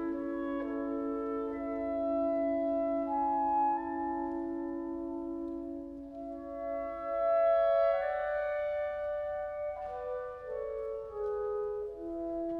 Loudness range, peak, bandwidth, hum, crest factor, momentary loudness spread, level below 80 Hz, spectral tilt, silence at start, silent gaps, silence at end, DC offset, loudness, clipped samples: 6 LU; -20 dBFS; 4.9 kHz; none; 14 dB; 11 LU; -60 dBFS; -8 dB/octave; 0 s; none; 0 s; under 0.1%; -34 LUFS; under 0.1%